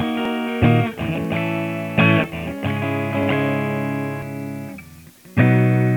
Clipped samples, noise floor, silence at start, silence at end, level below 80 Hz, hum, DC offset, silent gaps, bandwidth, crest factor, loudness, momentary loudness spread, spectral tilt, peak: under 0.1%; -43 dBFS; 0 s; 0 s; -46 dBFS; none; under 0.1%; none; 19.5 kHz; 18 dB; -20 LUFS; 13 LU; -7.5 dB/octave; -2 dBFS